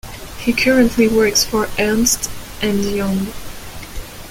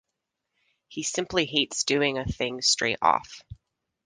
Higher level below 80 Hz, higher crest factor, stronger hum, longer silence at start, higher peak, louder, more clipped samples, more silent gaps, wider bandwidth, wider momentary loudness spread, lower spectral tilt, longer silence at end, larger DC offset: first, -34 dBFS vs -52 dBFS; about the same, 18 dB vs 22 dB; neither; second, 0.05 s vs 0.9 s; first, 0 dBFS vs -6 dBFS; first, -16 LUFS vs -25 LUFS; neither; neither; first, 17 kHz vs 11 kHz; first, 19 LU vs 12 LU; about the same, -3.5 dB/octave vs -2.5 dB/octave; second, 0 s vs 0.5 s; neither